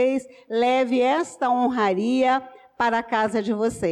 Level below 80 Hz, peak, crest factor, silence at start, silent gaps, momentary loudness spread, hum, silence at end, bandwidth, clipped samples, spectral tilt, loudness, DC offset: -60 dBFS; -12 dBFS; 10 dB; 0 s; none; 5 LU; none; 0 s; 12 kHz; under 0.1%; -5 dB/octave; -22 LUFS; under 0.1%